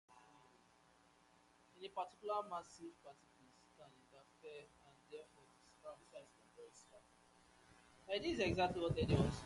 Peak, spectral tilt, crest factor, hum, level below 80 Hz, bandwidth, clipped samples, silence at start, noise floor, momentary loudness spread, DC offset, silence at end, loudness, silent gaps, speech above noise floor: -22 dBFS; -6 dB/octave; 24 dB; none; -60 dBFS; 11.5 kHz; under 0.1%; 0.1 s; -71 dBFS; 27 LU; under 0.1%; 0 s; -41 LUFS; none; 28 dB